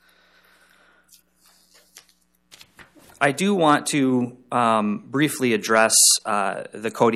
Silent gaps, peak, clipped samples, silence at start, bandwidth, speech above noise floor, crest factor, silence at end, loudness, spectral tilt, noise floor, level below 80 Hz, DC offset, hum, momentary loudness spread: none; -2 dBFS; under 0.1%; 1.95 s; 15 kHz; 42 dB; 20 dB; 0 s; -19 LUFS; -3 dB/octave; -62 dBFS; -70 dBFS; under 0.1%; none; 12 LU